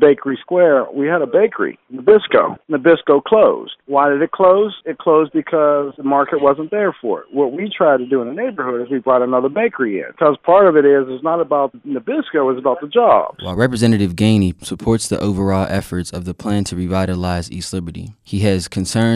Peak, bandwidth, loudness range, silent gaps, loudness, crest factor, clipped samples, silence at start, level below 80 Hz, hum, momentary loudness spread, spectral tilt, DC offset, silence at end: -2 dBFS; 13 kHz; 5 LU; none; -16 LUFS; 14 dB; under 0.1%; 0 s; -46 dBFS; none; 10 LU; -6 dB/octave; under 0.1%; 0 s